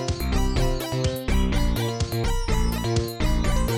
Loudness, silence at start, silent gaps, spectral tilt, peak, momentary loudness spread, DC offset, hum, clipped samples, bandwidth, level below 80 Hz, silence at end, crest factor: -25 LUFS; 0 s; none; -5.5 dB/octave; -12 dBFS; 2 LU; 0.4%; none; under 0.1%; 16 kHz; -26 dBFS; 0 s; 12 dB